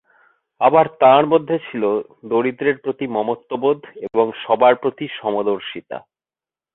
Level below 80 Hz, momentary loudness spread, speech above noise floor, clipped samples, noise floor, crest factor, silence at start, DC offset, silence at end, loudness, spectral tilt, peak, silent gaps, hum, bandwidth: -66 dBFS; 12 LU; over 72 dB; under 0.1%; under -90 dBFS; 18 dB; 0.6 s; under 0.1%; 0.75 s; -18 LUFS; -10 dB/octave; -2 dBFS; none; none; 4.1 kHz